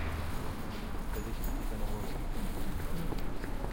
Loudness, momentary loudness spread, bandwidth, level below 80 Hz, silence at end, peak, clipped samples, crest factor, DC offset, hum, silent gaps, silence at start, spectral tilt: -40 LUFS; 2 LU; 17 kHz; -36 dBFS; 0 s; -20 dBFS; under 0.1%; 14 dB; under 0.1%; none; none; 0 s; -5.5 dB/octave